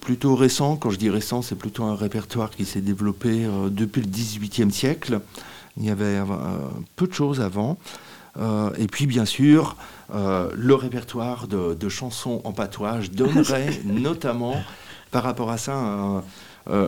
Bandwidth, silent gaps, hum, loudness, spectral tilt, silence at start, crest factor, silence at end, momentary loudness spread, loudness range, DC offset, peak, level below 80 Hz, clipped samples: 18 kHz; none; none; -24 LUFS; -6 dB/octave; 0 s; 20 dB; 0 s; 11 LU; 4 LU; 0.2%; -4 dBFS; -56 dBFS; under 0.1%